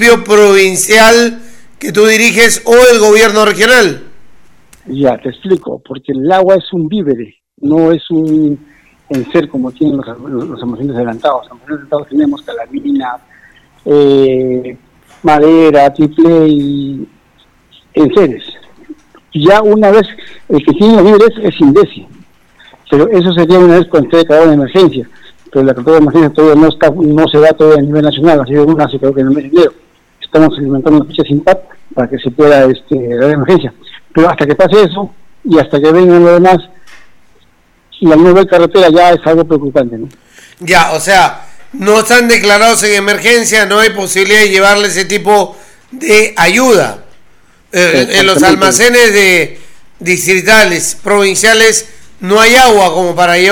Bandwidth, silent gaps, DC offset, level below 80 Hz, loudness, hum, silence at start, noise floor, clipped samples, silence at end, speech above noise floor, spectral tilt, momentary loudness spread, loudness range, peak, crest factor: 18.5 kHz; none; under 0.1%; -40 dBFS; -7 LUFS; none; 0 s; -49 dBFS; 1%; 0 s; 41 dB; -4 dB/octave; 14 LU; 6 LU; 0 dBFS; 8 dB